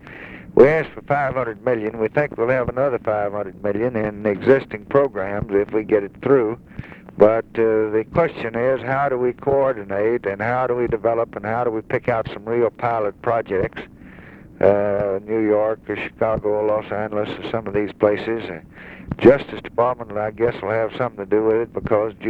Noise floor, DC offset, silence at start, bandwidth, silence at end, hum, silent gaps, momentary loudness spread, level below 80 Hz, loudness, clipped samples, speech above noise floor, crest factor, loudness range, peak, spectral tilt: -41 dBFS; under 0.1%; 0.05 s; 5.4 kHz; 0 s; none; none; 9 LU; -48 dBFS; -20 LUFS; under 0.1%; 22 dB; 20 dB; 2 LU; 0 dBFS; -9 dB/octave